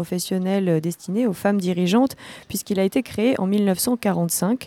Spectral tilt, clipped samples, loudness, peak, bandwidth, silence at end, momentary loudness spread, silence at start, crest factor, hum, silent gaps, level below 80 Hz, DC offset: -5.5 dB/octave; under 0.1%; -22 LUFS; -8 dBFS; 17.5 kHz; 0 s; 5 LU; 0 s; 14 dB; none; none; -60 dBFS; under 0.1%